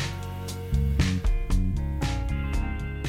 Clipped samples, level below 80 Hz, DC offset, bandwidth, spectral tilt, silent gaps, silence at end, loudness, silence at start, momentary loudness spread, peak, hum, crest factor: under 0.1%; -28 dBFS; under 0.1%; 16 kHz; -6 dB/octave; none; 0 s; -28 LUFS; 0 s; 8 LU; -10 dBFS; none; 16 dB